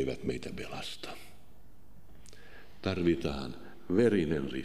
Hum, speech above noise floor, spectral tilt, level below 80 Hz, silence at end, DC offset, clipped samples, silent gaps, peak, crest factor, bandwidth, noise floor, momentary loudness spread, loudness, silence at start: none; 27 dB; -6.5 dB/octave; -54 dBFS; 0 s; 0.7%; under 0.1%; none; -14 dBFS; 20 dB; 15.5 kHz; -59 dBFS; 21 LU; -33 LUFS; 0 s